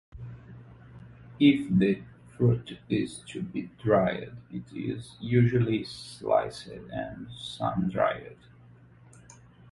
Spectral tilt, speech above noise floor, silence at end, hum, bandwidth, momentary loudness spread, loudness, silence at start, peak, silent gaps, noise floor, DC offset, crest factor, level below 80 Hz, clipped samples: -7.5 dB/octave; 26 dB; 1.4 s; none; 11.5 kHz; 21 LU; -28 LUFS; 0.15 s; -8 dBFS; none; -54 dBFS; under 0.1%; 20 dB; -56 dBFS; under 0.1%